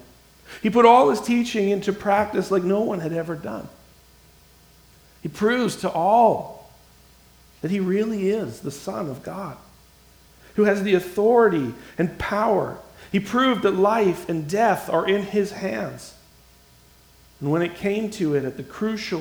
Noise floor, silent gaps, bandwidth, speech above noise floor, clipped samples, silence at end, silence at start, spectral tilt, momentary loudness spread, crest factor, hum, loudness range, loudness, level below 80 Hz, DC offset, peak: -53 dBFS; none; over 20 kHz; 32 dB; under 0.1%; 0 s; 0.5 s; -6 dB/octave; 16 LU; 22 dB; none; 8 LU; -22 LUFS; -54 dBFS; under 0.1%; 0 dBFS